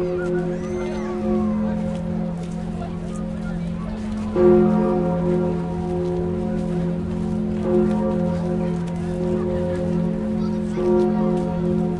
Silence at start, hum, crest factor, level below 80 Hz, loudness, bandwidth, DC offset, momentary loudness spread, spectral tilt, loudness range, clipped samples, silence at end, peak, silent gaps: 0 s; none; 16 dB; -38 dBFS; -22 LUFS; 10.5 kHz; under 0.1%; 9 LU; -9 dB/octave; 5 LU; under 0.1%; 0 s; -4 dBFS; none